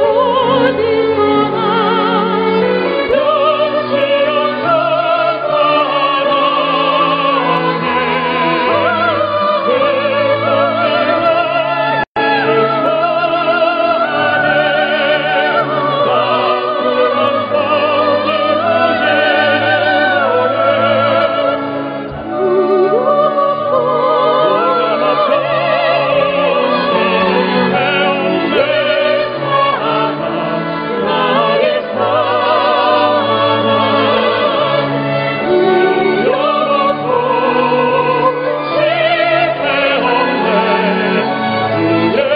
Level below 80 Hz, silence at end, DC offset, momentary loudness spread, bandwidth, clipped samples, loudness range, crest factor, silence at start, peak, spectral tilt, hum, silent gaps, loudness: -54 dBFS; 0 s; under 0.1%; 3 LU; 5.2 kHz; under 0.1%; 1 LU; 12 dB; 0 s; -2 dBFS; -8.5 dB/octave; none; 12.07-12.15 s; -13 LUFS